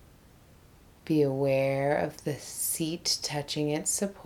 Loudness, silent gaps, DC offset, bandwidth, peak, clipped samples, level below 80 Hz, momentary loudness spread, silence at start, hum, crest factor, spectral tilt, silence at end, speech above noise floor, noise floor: -29 LUFS; none; under 0.1%; 19.5 kHz; -14 dBFS; under 0.1%; -60 dBFS; 7 LU; 1.05 s; none; 16 dB; -4 dB/octave; 0 s; 27 dB; -56 dBFS